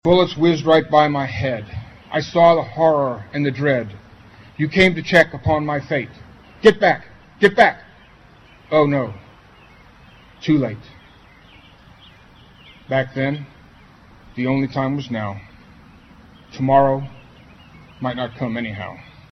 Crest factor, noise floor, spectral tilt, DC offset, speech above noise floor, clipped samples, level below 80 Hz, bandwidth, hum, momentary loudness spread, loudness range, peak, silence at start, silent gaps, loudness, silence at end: 20 dB; -47 dBFS; -6.5 dB/octave; under 0.1%; 30 dB; under 0.1%; -48 dBFS; 11 kHz; none; 20 LU; 10 LU; -2 dBFS; 0.05 s; none; -18 LUFS; 0.35 s